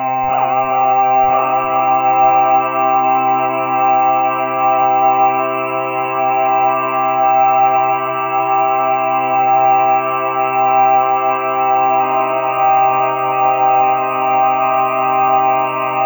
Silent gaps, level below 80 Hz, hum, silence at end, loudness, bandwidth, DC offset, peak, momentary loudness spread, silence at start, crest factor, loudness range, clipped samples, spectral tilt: none; -58 dBFS; none; 0 s; -14 LUFS; over 20 kHz; under 0.1%; -2 dBFS; 4 LU; 0 s; 12 dB; 1 LU; under 0.1%; -10 dB/octave